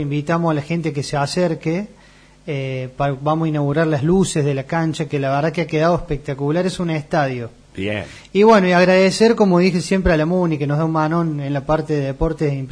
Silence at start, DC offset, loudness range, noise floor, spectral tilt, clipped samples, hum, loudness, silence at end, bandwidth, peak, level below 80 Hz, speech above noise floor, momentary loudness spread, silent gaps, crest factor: 0 s; under 0.1%; 6 LU; -47 dBFS; -6.5 dB/octave; under 0.1%; none; -18 LUFS; 0 s; 10.5 kHz; -2 dBFS; -38 dBFS; 30 dB; 11 LU; none; 16 dB